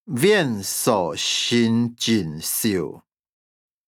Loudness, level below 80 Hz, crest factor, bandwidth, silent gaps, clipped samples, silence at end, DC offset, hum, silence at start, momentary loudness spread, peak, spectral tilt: -21 LUFS; -62 dBFS; 18 dB; 20 kHz; none; under 0.1%; 0.9 s; under 0.1%; none; 0.05 s; 6 LU; -4 dBFS; -4 dB/octave